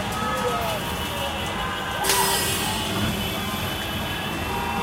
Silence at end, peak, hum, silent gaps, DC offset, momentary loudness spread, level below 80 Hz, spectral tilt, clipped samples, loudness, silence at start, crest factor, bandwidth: 0 s; -6 dBFS; none; none; under 0.1%; 7 LU; -40 dBFS; -3 dB/octave; under 0.1%; -24 LUFS; 0 s; 20 dB; 16 kHz